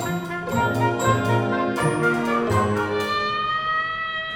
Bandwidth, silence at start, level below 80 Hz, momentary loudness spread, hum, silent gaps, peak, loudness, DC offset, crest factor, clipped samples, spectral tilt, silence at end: 17.5 kHz; 0 s; -50 dBFS; 4 LU; none; none; -8 dBFS; -22 LUFS; under 0.1%; 16 dB; under 0.1%; -5.5 dB/octave; 0 s